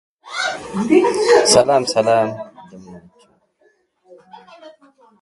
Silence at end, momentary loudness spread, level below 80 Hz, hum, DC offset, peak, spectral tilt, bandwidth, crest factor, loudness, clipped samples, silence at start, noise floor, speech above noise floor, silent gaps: 0.55 s; 16 LU; -56 dBFS; none; under 0.1%; 0 dBFS; -3.5 dB/octave; 11.5 kHz; 18 dB; -15 LUFS; under 0.1%; 0.25 s; -60 dBFS; 45 dB; none